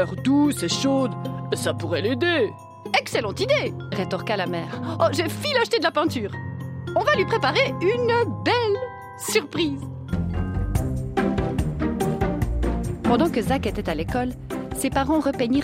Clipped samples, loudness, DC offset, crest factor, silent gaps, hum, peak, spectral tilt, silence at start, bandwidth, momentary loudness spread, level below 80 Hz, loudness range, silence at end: under 0.1%; -23 LUFS; under 0.1%; 16 dB; none; none; -6 dBFS; -5.5 dB/octave; 0 s; 16 kHz; 8 LU; -36 dBFS; 3 LU; 0 s